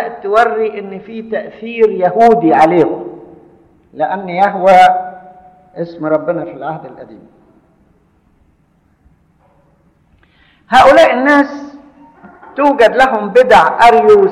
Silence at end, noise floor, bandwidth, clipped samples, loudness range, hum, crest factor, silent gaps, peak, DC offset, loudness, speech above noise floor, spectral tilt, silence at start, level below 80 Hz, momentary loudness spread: 0 s; -54 dBFS; 12.5 kHz; under 0.1%; 13 LU; none; 12 dB; none; 0 dBFS; under 0.1%; -10 LUFS; 44 dB; -5.5 dB/octave; 0 s; -46 dBFS; 19 LU